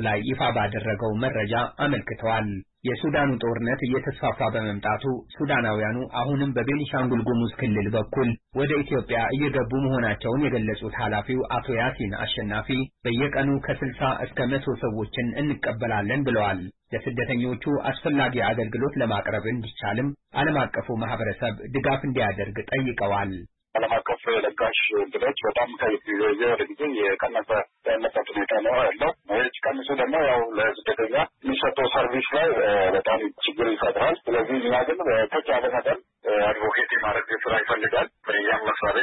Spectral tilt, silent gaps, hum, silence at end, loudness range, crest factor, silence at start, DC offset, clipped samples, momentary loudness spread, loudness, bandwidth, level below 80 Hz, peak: -10.5 dB/octave; none; none; 0 s; 3 LU; 14 dB; 0 s; under 0.1%; under 0.1%; 6 LU; -25 LUFS; 4.1 kHz; -50 dBFS; -10 dBFS